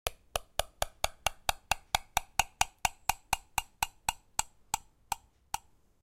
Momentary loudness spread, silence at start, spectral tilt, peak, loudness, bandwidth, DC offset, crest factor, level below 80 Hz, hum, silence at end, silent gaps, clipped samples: 9 LU; 0.05 s; -0.5 dB/octave; -6 dBFS; -35 LUFS; 17 kHz; under 0.1%; 30 dB; -50 dBFS; none; 0.45 s; none; under 0.1%